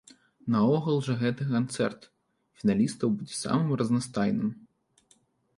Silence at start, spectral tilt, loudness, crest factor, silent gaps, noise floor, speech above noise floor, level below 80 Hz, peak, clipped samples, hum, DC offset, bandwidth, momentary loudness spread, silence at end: 0.45 s; -6.5 dB/octave; -28 LUFS; 16 dB; none; -66 dBFS; 39 dB; -64 dBFS; -12 dBFS; under 0.1%; none; under 0.1%; 11.5 kHz; 7 LU; 1 s